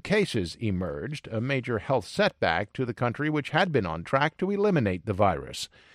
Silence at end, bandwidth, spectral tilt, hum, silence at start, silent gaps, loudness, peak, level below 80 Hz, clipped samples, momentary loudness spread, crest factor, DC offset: 0.3 s; 15 kHz; -6 dB/octave; none; 0.05 s; none; -27 LUFS; -8 dBFS; -54 dBFS; under 0.1%; 8 LU; 18 dB; under 0.1%